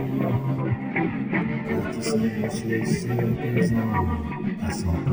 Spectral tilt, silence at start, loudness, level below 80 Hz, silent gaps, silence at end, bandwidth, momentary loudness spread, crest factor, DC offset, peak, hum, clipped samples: -7 dB/octave; 0 s; -25 LUFS; -42 dBFS; none; 0 s; over 20 kHz; 5 LU; 14 dB; under 0.1%; -10 dBFS; none; under 0.1%